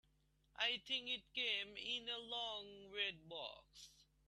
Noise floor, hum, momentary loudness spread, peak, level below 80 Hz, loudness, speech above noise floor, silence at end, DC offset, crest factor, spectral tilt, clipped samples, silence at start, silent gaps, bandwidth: -78 dBFS; none; 15 LU; -26 dBFS; -78 dBFS; -43 LUFS; 31 dB; 0.25 s; under 0.1%; 22 dB; -1.5 dB/octave; under 0.1%; 0.55 s; none; 13.5 kHz